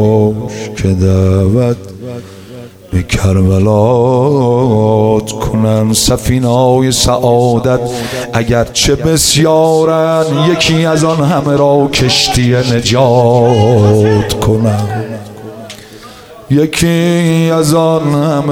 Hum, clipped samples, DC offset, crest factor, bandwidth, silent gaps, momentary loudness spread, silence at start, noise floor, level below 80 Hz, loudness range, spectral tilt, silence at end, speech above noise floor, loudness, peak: none; under 0.1%; under 0.1%; 10 dB; 16.5 kHz; none; 12 LU; 0 s; -33 dBFS; -30 dBFS; 4 LU; -5.5 dB/octave; 0 s; 23 dB; -10 LUFS; 0 dBFS